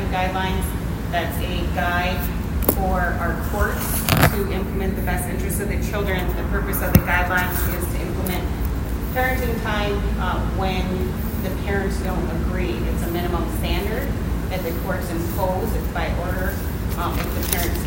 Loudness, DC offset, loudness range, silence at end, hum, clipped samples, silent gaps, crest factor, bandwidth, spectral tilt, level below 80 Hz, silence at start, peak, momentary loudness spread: -23 LUFS; under 0.1%; 3 LU; 0 s; none; under 0.1%; none; 22 dB; 16.5 kHz; -5.5 dB/octave; -26 dBFS; 0 s; 0 dBFS; 6 LU